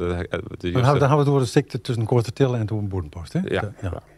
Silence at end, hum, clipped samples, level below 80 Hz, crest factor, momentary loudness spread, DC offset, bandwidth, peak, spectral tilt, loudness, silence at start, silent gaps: 0.15 s; none; under 0.1%; -46 dBFS; 18 dB; 11 LU; under 0.1%; 12.5 kHz; -4 dBFS; -7 dB/octave; -22 LUFS; 0 s; none